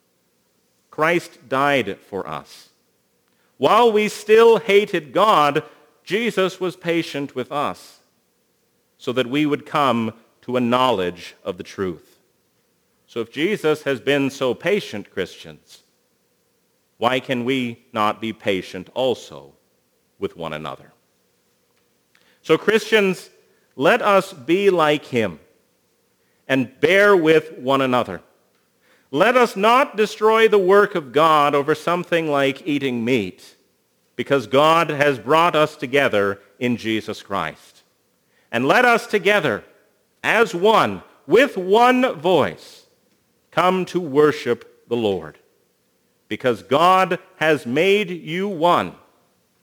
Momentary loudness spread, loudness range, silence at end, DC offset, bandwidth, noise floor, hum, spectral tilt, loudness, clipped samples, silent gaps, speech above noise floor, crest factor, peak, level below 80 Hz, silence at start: 15 LU; 8 LU; 0.7 s; under 0.1%; over 20 kHz; -65 dBFS; none; -5 dB/octave; -19 LUFS; under 0.1%; none; 46 dB; 20 dB; 0 dBFS; -66 dBFS; 1 s